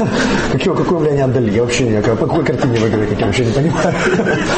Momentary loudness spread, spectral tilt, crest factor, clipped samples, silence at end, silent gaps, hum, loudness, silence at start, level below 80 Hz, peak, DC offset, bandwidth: 1 LU; -6 dB/octave; 10 dB; under 0.1%; 0 s; none; none; -15 LUFS; 0 s; -34 dBFS; -4 dBFS; under 0.1%; 8.8 kHz